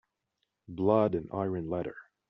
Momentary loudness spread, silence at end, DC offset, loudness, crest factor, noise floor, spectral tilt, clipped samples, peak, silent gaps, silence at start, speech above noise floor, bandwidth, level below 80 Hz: 13 LU; 0.25 s; under 0.1%; -30 LUFS; 20 dB; -82 dBFS; -8 dB/octave; under 0.1%; -12 dBFS; none; 0.7 s; 52 dB; 5.6 kHz; -64 dBFS